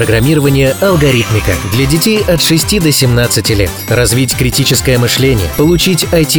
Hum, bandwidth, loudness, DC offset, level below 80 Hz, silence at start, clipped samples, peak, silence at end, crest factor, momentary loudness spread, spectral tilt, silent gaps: none; over 20 kHz; -10 LUFS; 0.7%; -24 dBFS; 0 s; under 0.1%; 0 dBFS; 0 s; 10 dB; 3 LU; -4.5 dB/octave; none